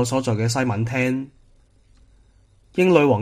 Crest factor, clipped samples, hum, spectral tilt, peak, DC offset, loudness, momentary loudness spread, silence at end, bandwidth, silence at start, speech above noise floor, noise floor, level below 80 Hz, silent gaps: 20 dB; under 0.1%; none; -6 dB/octave; -2 dBFS; under 0.1%; -21 LUFS; 13 LU; 0 s; 15.5 kHz; 0 s; 36 dB; -55 dBFS; -54 dBFS; none